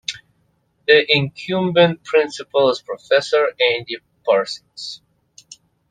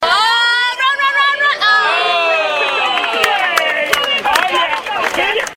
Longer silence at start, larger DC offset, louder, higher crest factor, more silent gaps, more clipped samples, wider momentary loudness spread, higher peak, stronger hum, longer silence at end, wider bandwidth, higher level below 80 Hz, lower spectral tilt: about the same, 0.1 s vs 0 s; neither; second, -18 LUFS vs -13 LUFS; about the same, 18 dB vs 14 dB; neither; neither; first, 16 LU vs 4 LU; about the same, 0 dBFS vs 0 dBFS; neither; first, 0.95 s vs 0 s; second, 9.4 kHz vs 16.5 kHz; second, -62 dBFS vs -52 dBFS; first, -4.5 dB/octave vs 0 dB/octave